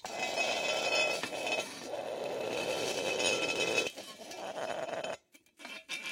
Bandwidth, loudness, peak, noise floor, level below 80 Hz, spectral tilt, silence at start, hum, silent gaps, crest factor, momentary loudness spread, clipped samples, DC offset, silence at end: 16.5 kHz; -33 LUFS; -16 dBFS; -57 dBFS; -76 dBFS; -1.5 dB/octave; 0.05 s; none; none; 20 dB; 14 LU; under 0.1%; under 0.1%; 0 s